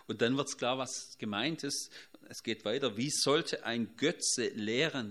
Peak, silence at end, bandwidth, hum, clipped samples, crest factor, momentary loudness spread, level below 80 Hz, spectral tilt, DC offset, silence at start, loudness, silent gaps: -14 dBFS; 0 s; 14.5 kHz; none; under 0.1%; 20 dB; 9 LU; -78 dBFS; -3 dB/octave; under 0.1%; 0.1 s; -33 LUFS; none